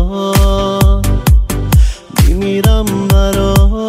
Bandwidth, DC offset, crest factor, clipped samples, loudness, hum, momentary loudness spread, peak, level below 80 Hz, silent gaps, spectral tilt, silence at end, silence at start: 16 kHz; under 0.1%; 10 dB; under 0.1%; -12 LUFS; none; 2 LU; 0 dBFS; -12 dBFS; none; -6 dB/octave; 0 s; 0 s